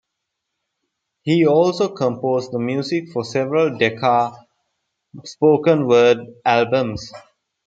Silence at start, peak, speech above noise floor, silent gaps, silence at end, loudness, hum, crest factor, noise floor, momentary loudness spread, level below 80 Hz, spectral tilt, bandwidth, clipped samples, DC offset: 1.25 s; 0 dBFS; 61 dB; none; 0.45 s; -18 LUFS; none; 18 dB; -78 dBFS; 12 LU; -58 dBFS; -6 dB/octave; 7.8 kHz; under 0.1%; under 0.1%